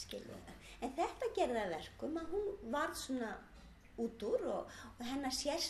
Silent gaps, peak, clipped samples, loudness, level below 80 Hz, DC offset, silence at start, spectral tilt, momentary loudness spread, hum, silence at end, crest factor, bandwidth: none; -24 dBFS; under 0.1%; -41 LUFS; -62 dBFS; under 0.1%; 0 s; -3.5 dB/octave; 15 LU; none; 0 s; 18 dB; 13.5 kHz